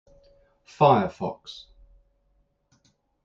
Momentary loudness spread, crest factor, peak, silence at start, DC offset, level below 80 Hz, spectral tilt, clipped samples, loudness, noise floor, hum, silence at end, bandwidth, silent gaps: 23 LU; 22 dB; -6 dBFS; 0.8 s; under 0.1%; -60 dBFS; -7.5 dB/octave; under 0.1%; -23 LUFS; -68 dBFS; none; 1.7 s; 7.6 kHz; none